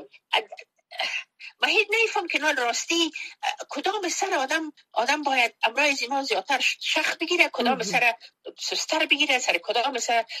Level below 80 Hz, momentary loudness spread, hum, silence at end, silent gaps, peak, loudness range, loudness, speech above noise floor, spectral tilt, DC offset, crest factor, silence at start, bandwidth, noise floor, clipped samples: -80 dBFS; 10 LU; none; 0 s; none; -4 dBFS; 2 LU; -24 LUFS; 21 dB; -0.5 dB/octave; under 0.1%; 22 dB; 0 s; 14 kHz; -46 dBFS; under 0.1%